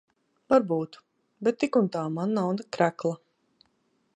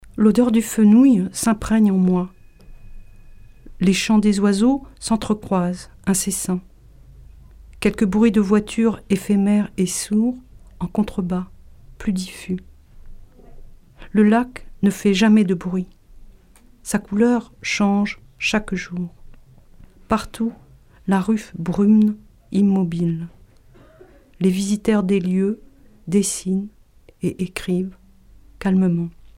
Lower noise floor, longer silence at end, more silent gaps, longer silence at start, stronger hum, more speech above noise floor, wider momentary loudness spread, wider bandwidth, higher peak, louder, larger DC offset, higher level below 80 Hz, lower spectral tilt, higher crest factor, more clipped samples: first, -71 dBFS vs -49 dBFS; first, 1 s vs 0.25 s; neither; first, 0.5 s vs 0.15 s; neither; first, 45 dB vs 31 dB; second, 9 LU vs 12 LU; second, 10 kHz vs 16 kHz; second, -8 dBFS vs -4 dBFS; second, -27 LUFS vs -20 LUFS; neither; second, -72 dBFS vs -44 dBFS; about the same, -7 dB/octave vs -6 dB/octave; about the same, 20 dB vs 16 dB; neither